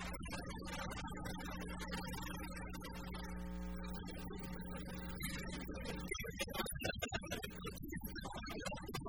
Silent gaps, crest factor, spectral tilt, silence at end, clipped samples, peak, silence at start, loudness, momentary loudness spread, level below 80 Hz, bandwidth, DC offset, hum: none; 20 dB; -4.5 dB/octave; 0 s; under 0.1%; -26 dBFS; 0 s; -46 LUFS; 6 LU; -52 dBFS; over 20 kHz; 0.1%; none